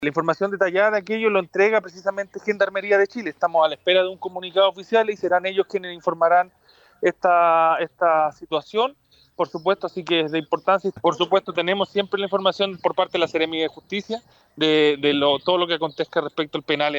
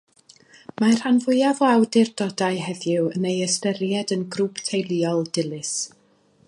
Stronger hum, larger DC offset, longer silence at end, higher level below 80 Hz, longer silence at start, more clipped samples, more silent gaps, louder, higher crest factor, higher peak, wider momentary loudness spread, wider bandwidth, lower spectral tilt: neither; neither; second, 0 s vs 0.6 s; about the same, -68 dBFS vs -70 dBFS; second, 0 s vs 0.8 s; neither; neither; about the same, -21 LUFS vs -22 LUFS; about the same, 16 dB vs 18 dB; about the same, -6 dBFS vs -6 dBFS; about the same, 8 LU vs 8 LU; first, 19 kHz vs 11.5 kHz; about the same, -5 dB/octave vs -4.5 dB/octave